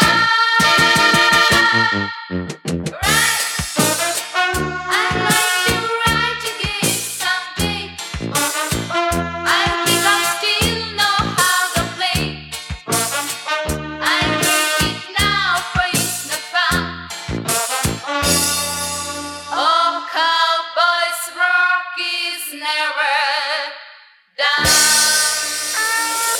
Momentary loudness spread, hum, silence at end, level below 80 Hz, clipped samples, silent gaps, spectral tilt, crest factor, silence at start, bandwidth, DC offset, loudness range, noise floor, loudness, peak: 12 LU; none; 0 s; -40 dBFS; under 0.1%; none; -2 dB/octave; 18 dB; 0 s; over 20 kHz; under 0.1%; 3 LU; -45 dBFS; -16 LUFS; 0 dBFS